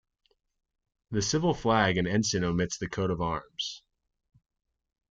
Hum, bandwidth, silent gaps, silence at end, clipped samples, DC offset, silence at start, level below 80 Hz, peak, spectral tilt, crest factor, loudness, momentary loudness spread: none; 9.2 kHz; none; 1.35 s; under 0.1%; under 0.1%; 1.1 s; -54 dBFS; -10 dBFS; -4.5 dB/octave; 22 dB; -29 LUFS; 10 LU